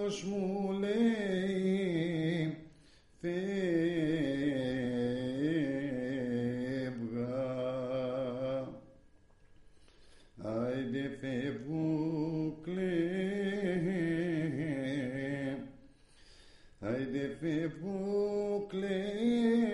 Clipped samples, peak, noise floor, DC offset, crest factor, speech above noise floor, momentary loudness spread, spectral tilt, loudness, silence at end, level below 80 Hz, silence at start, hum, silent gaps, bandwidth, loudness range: under 0.1%; -20 dBFS; -61 dBFS; under 0.1%; 14 dB; 29 dB; 6 LU; -7 dB/octave; -35 LUFS; 0 s; -62 dBFS; 0 s; none; none; 11.5 kHz; 6 LU